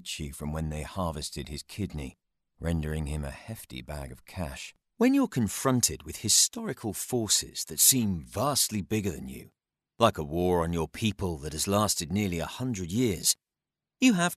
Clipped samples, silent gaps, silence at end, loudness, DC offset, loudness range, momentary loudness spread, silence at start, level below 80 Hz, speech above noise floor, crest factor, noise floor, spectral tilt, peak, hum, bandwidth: under 0.1%; none; 0 s; -28 LUFS; under 0.1%; 11 LU; 17 LU; 0.05 s; -46 dBFS; 61 dB; 22 dB; -90 dBFS; -3.5 dB/octave; -6 dBFS; none; 14 kHz